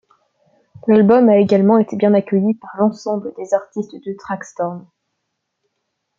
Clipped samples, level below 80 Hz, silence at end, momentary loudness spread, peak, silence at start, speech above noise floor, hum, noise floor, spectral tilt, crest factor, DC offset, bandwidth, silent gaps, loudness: under 0.1%; -64 dBFS; 1.4 s; 16 LU; -2 dBFS; 0.85 s; 59 dB; none; -74 dBFS; -8 dB/octave; 16 dB; under 0.1%; 7.4 kHz; none; -16 LUFS